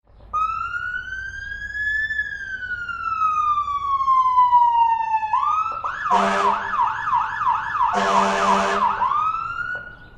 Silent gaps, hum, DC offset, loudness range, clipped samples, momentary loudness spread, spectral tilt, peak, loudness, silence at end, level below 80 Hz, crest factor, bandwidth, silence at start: none; none; under 0.1%; 5 LU; under 0.1%; 11 LU; -3.5 dB/octave; -4 dBFS; -21 LUFS; 0 s; -48 dBFS; 16 dB; 10.5 kHz; 0.25 s